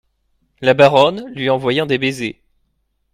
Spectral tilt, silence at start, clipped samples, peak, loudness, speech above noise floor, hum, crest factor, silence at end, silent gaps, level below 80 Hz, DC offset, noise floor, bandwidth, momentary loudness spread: -5.5 dB/octave; 0.6 s; under 0.1%; 0 dBFS; -15 LUFS; 52 dB; none; 16 dB; 0.8 s; none; -54 dBFS; under 0.1%; -66 dBFS; 14 kHz; 12 LU